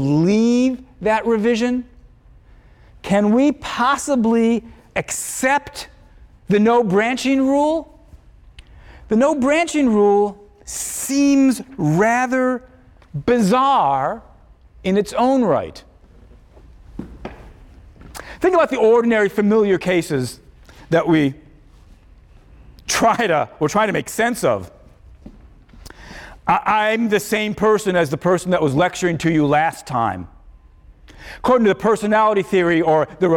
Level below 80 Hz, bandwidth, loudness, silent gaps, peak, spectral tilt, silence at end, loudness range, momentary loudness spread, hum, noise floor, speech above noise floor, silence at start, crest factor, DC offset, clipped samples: -46 dBFS; 17.5 kHz; -18 LUFS; none; -4 dBFS; -5.5 dB/octave; 0 s; 4 LU; 14 LU; none; -47 dBFS; 30 dB; 0 s; 14 dB; under 0.1%; under 0.1%